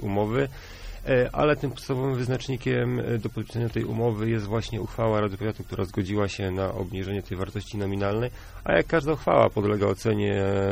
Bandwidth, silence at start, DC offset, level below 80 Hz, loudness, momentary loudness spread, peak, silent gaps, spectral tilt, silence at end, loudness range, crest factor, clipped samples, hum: 16 kHz; 0 s; under 0.1%; -44 dBFS; -26 LUFS; 9 LU; -6 dBFS; none; -7 dB/octave; 0 s; 4 LU; 20 dB; under 0.1%; none